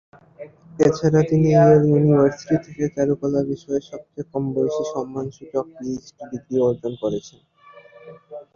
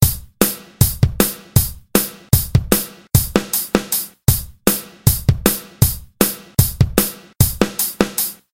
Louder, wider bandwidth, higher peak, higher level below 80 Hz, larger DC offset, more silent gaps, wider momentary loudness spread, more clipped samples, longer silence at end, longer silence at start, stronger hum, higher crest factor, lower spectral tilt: second, -20 LUFS vs -17 LUFS; second, 7.2 kHz vs 17.5 kHz; second, -4 dBFS vs 0 dBFS; second, -54 dBFS vs -30 dBFS; neither; neither; first, 18 LU vs 3 LU; neither; about the same, 0.15 s vs 0.2 s; first, 0.4 s vs 0 s; neither; about the same, 18 dB vs 18 dB; first, -8 dB/octave vs -4.5 dB/octave